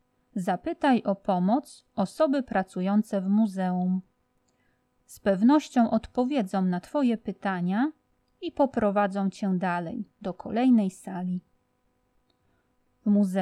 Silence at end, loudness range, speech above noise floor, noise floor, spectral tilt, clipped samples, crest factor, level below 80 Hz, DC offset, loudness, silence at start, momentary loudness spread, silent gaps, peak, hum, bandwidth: 0 s; 3 LU; 46 dB; -71 dBFS; -7.5 dB/octave; under 0.1%; 16 dB; -62 dBFS; under 0.1%; -27 LUFS; 0.35 s; 11 LU; none; -10 dBFS; none; 12.5 kHz